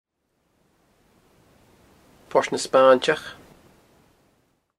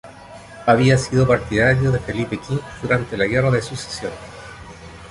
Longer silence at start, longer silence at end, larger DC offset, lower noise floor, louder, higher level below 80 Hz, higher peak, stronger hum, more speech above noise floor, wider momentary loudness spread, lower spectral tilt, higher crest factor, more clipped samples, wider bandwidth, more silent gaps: first, 2.35 s vs 0.05 s; first, 1.45 s vs 0 s; neither; first, -72 dBFS vs -40 dBFS; about the same, -20 LUFS vs -19 LUFS; second, -66 dBFS vs -40 dBFS; about the same, -2 dBFS vs -2 dBFS; neither; first, 52 dB vs 21 dB; second, 11 LU vs 22 LU; second, -3.5 dB/octave vs -6 dB/octave; first, 24 dB vs 18 dB; neither; first, 13 kHz vs 11.5 kHz; neither